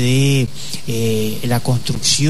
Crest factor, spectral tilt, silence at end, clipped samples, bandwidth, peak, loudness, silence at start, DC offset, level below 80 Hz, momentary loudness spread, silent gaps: 14 dB; -4.5 dB/octave; 0 s; under 0.1%; 13.5 kHz; -4 dBFS; -18 LUFS; 0 s; 7%; -40 dBFS; 9 LU; none